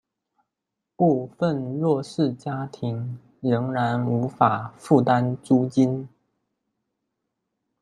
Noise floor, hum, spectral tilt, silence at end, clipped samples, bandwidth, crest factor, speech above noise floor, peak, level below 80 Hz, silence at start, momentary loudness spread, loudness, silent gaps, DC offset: -84 dBFS; none; -8 dB/octave; 1.75 s; under 0.1%; 11 kHz; 22 dB; 61 dB; -2 dBFS; -66 dBFS; 1 s; 10 LU; -23 LUFS; none; under 0.1%